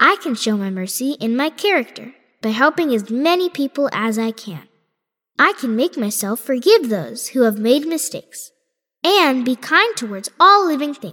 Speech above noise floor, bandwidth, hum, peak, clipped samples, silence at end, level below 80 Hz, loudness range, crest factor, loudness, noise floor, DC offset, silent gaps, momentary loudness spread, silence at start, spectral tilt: 59 dB; 18.5 kHz; none; 0 dBFS; under 0.1%; 0 s; -76 dBFS; 3 LU; 18 dB; -17 LUFS; -77 dBFS; under 0.1%; none; 13 LU; 0 s; -3.5 dB/octave